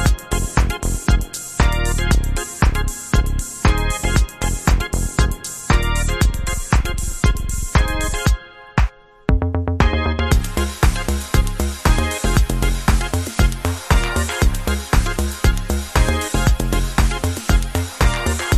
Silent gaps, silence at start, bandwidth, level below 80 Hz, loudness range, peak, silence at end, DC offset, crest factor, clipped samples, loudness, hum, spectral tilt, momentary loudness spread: none; 0 s; 14 kHz; -20 dBFS; 1 LU; 0 dBFS; 0 s; under 0.1%; 18 dB; under 0.1%; -20 LUFS; none; -4.5 dB/octave; 4 LU